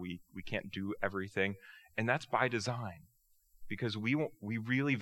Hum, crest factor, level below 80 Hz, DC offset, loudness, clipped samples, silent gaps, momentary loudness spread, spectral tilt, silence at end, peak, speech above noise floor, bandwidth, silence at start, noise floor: none; 24 dB; -66 dBFS; under 0.1%; -36 LUFS; under 0.1%; none; 12 LU; -6 dB/octave; 0 s; -14 dBFS; 32 dB; 16.5 kHz; 0 s; -68 dBFS